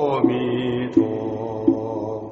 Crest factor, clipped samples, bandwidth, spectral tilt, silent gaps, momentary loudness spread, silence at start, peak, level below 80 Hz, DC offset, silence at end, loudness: 18 dB; under 0.1%; 6.6 kHz; -6.5 dB/octave; none; 7 LU; 0 s; -4 dBFS; -54 dBFS; under 0.1%; 0 s; -22 LUFS